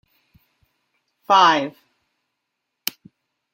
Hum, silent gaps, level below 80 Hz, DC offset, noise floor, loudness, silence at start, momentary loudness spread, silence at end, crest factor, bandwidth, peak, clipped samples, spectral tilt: none; none; -74 dBFS; under 0.1%; -79 dBFS; -18 LUFS; 1.3 s; 16 LU; 1.85 s; 24 dB; 16.5 kHz; 0 dBFS; under 0.1%; -2.5 dB/octave